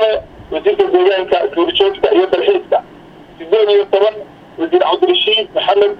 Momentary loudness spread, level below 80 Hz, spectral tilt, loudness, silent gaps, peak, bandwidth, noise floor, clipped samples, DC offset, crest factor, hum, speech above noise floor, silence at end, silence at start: 9 LU; -48 dBFS; -5.5 dB/octave; -13 LUFS; none; 0 dBFS; 5.4 kHz; -38 dBFS; under 0.1%; under 0.1%; 14 dB; none; 25 dB; 0 s; 0 s